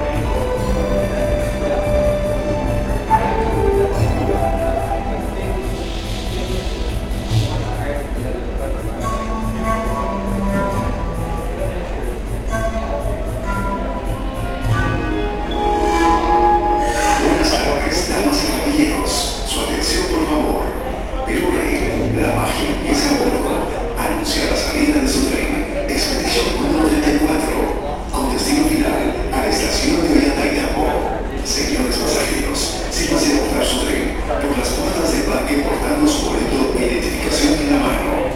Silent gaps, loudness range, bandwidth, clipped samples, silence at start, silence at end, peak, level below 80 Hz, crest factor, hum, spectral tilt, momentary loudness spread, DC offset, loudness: none; 6 LU; 16.5 kHz; under 0.1%; 0 s; 0 s; 0 dBFS; -26 dBFS; 18 dB; none; -4.5 dB/octave; 8 LU; 0.5%; -18 LUFS